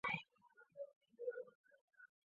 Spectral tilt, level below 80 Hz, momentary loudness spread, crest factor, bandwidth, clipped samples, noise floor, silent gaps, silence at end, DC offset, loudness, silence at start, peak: -2 dB/octave; -86 dBFS; 21 LU; 22 dB; 7 kHz; under 0.1%; -71 dBFS; 0.96-1.01 s, 1.55-1.64 s, 1.81-1.88 s; 0.3 s; under 0.1%; -50 LUFS; 0.05 s; -28 dBFS